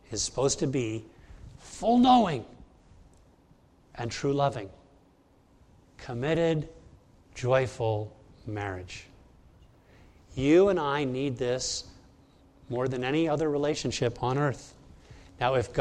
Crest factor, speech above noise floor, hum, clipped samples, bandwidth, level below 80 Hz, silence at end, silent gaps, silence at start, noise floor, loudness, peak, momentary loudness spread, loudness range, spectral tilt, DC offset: 20 dB; 34 dB; none; under 0.1%; 11 kHz; -54 dBFS; 0 s; none; 0.1 s; -61 dBFS; -28 LUFS; -10 dBFS; 21 LU; 6 LU; -5 dB/octave; under 0.1%